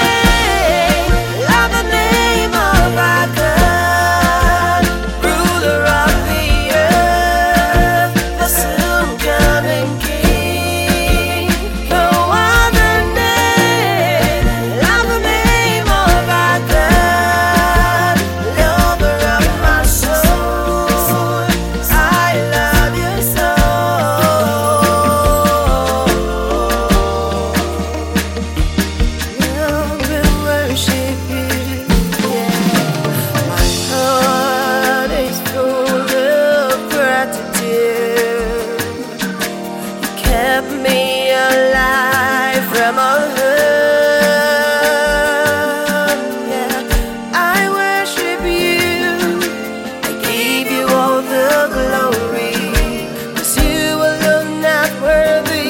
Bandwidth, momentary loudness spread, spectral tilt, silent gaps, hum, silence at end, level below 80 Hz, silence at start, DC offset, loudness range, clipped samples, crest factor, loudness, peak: 17 kHz; 6 LU; -4 dB/octave; none; none; 0 s; -22 dBFS; 0 s; under 0.1%; 4 LU; under 0.1%; 14 dB; -13 LUFS; 0 dBFS